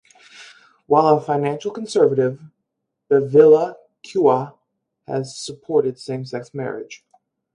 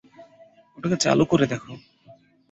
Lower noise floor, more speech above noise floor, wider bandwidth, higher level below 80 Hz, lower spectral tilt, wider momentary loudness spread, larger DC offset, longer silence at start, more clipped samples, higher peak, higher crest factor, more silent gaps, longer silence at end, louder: first, -78 dBFS vs -54 dBFS; first, 60 dB vs 32 dB; first, 10.5 kHz vs 8.2 kHz; second, -68 dBFS vs -56 dBFS; first, -6.5 dB/octave vs -5 dB/octave; second, 17 LU vs 22 LU; neither; first, 0.4 s vs 0.2 s; neither; first, 0 dBFS vs -4 dBFS; about the same, 20 dB vs 20 dB; neither; second, 0.6 s vs 0.75 s; first, -19 LUFS vs -22 LUFS